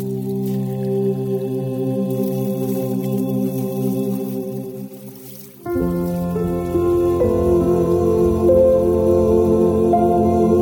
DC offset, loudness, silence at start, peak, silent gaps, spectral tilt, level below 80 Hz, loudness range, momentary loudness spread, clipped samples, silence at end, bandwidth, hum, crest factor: under 0.1%; -18 LUFS; 0 s; -4 dBFS; none; -9 dB/octave; -38 dBFS; 8 LU; 11 LU; under 0.1%; 0 s; 19.5 kHz; none; 14 dB